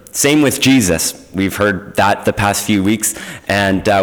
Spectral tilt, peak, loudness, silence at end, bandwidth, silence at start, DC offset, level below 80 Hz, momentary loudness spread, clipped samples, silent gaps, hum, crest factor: -4 dB/octave; -4 dBFS; -14 LUFS; 0 s; over 20 kHz; 0.15 s; 0.1%; -40 dBFS; 7 LU; under 0.1%; none; none; 10 dB